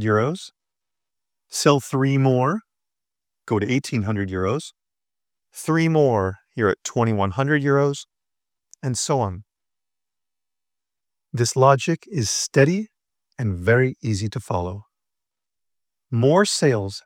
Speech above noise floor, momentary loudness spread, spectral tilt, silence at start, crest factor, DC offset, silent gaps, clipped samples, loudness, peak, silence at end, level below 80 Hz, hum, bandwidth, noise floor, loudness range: 69 dB; 13 LU; -5.5 dB/octave; 0 s; 20 dB; under 0.1%; none; under 0.1%; -21 LUFS; -2 dBFS; 0.05 s; -58 dBFS; none; 16 kHz; -90 dBFS; 5 LU